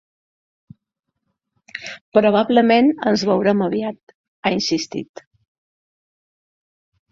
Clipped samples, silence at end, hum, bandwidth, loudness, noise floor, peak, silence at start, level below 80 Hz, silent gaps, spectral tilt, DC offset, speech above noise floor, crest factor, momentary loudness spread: under 0.1%; 2.05 s; none; 7.6 kHz; -18 LUFS; -79 dBFS; -2 dBFS; 1.75 s; -62 dBFS; 2.01-2.12 s, 4.03-4.07 s, 4.15-4.43 s; -5 dB/octave; under 0.1%; 62 dB; 20 dB; 17 LU